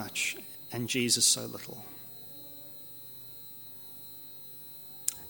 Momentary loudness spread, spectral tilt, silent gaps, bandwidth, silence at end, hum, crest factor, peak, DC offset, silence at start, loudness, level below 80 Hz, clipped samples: 19 LU; -1.5 dB/octave; none; 17 kHz; 0 s; 50 Hz at -65 dBFS; 28 dB; -8 dBFS; under 0.1%; 0 s; -29 LUFS; -70 dBFS; under 0.1%